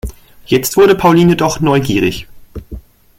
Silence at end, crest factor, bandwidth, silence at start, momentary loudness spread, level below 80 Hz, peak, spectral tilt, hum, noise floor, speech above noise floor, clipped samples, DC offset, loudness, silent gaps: 0.4 s; 12 dB; 17 kHz; 0.05 s; 22 LU; -34 dBFS; 0 dBFS; -5.5 dB/octave; none; -32 dBFS; 21 dB; under 0.1%; under 0.1%; -11 LUFS; none